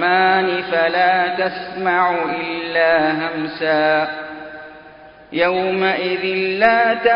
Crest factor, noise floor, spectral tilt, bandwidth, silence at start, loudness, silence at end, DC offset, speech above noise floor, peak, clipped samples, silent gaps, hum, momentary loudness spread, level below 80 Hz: 18 dB; -42 dBFS; -8 dB/octave; 5.4 kHz; 0 s; -17 LUFS; 0 s; under 0.1%; 25 dB; 0 dBFS; under 0.1%; none; none; 10 LU; -56 dBFS